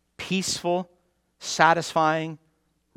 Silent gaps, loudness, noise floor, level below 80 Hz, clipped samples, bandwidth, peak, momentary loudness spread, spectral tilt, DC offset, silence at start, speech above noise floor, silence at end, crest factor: none; -24 LUFS; -69 dBFS; -64 dBFS; under 0.1%; 17 kHz; -2 dBFS; 16 LU; -3.5 dB/octave; under 0.1%; 0.2 s; 46 dB; 0.6 s; 24 dB